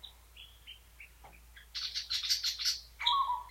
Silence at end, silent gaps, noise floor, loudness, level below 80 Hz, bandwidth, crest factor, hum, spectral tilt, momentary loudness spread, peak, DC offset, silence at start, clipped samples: 0 s; none; -56 dBFS; -32 LUFS; -60 dBFS; 16.5 kHz; 22 dB; none; 2 dB/octave; 23 LU; -16 dBFS; under 0.1%; 0 s; under 0.1%